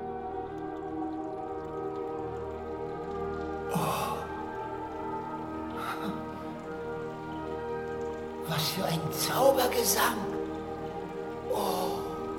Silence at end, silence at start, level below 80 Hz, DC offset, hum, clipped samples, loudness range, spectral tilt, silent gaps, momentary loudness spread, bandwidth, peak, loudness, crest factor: 0 s; 0 s; -54 dBFS; under 0.1%; none; under 0.1%; 8 LU; -4 dB/octave; none; 12 LU; 16.5 kHz; -10 dBFS; -33 LUFS; 22 dB